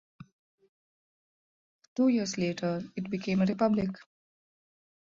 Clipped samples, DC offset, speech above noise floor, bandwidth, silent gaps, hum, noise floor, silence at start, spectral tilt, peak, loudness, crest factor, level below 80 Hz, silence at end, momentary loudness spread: under 0.1%; under 0.1%; over 61 dB; 7.6 kHz; 0.32-0.58 s, 0.69-1.79 s, 1.88-1.96 s; none; under -90 dBFS; 0.2 s; -6 dB/octave; -14 dBFS; -30 LUFS; 18 dB; -66 dBFS; 1.15 s; 10 LU